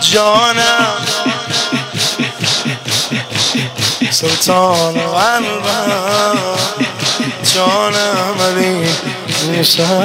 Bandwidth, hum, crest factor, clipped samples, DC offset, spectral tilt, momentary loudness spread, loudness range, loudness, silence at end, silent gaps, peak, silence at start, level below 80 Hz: 16.5 kHz; none; 14 dB; under 0.1%; under 0.1%; -3 dB/octave; 5 LU; 1 LU; -13 LUFS; 0 s; none; 0 dBFS; 0 s; -54 dBFS